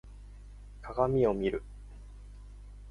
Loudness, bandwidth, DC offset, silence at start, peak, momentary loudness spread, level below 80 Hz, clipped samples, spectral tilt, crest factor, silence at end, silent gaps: -30 LUFS; 11 kHz; under 0.1%; 0.05 s; -12 dBFS; 25 LU; -48 dBFS; under 0.1%; -8.5 dB/octave; 22 dB; 0 s; none